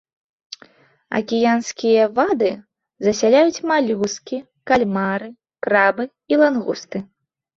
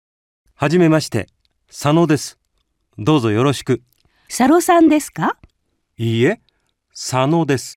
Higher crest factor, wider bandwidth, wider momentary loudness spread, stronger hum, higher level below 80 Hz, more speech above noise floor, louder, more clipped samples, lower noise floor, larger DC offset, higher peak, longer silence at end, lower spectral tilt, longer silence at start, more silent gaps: about the same, 18 dB vs 14 dB; second, 7.8 kHz vs 16 kHz; about the same, 15 LU vs 16 LU; neither; about the same, -60 dBFS vs -56 dBFS; second, 33 dB vs 52 dB; second, -19 LUFS vs -16 LUFS; neither; second, -51 dBFS vs -68 dBFS; neither; about the same, -2 dBFS vs -2 dBFS; first, 0.55 s vs 0.05 s; second, -4.5 dB/octave vs -6 dB/octave; first, 1.1 s vs 0.6 s; neither